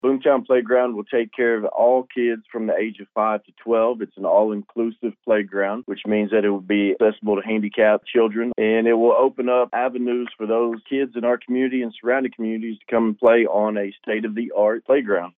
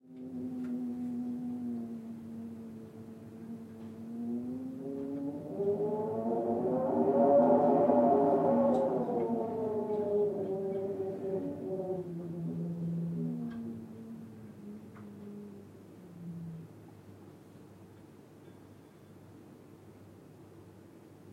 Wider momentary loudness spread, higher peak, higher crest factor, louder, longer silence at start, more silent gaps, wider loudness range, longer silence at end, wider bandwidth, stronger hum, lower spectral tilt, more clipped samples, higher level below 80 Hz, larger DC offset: second, 8 LU vs 27 LU; first, -4 dBFS vs -14 dBFS; about the same, 16 dB vs 20 dB; first, -21 LUFS vs -32 LUFS; about the same, 0.05 s vs 0.05 s; neither; second, 3 LU vs 21 LU; about the same, 0.1 s vs 0 s; second, 3.8 kHz vs 12 kHz; neither; about the same, -9 dB/octave vs -10 dB/octave; neither; about the same, -72 dBFS vs -74 dBFS; neither